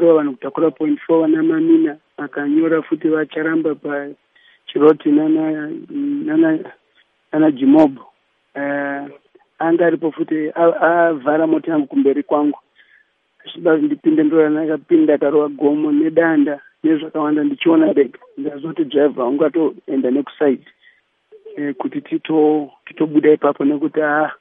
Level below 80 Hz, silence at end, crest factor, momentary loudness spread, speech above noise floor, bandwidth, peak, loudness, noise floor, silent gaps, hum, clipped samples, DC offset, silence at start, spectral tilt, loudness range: -72 dBFS; 0.05 s; 16 dB; 12 LU; 43 dB; 3.8 kHz; 0 dBFS; -17 LUFS; -59 dBFS; none; none; under 0.1%; under 0.1%; 0 s; -9.5 dB/octave; 4 LU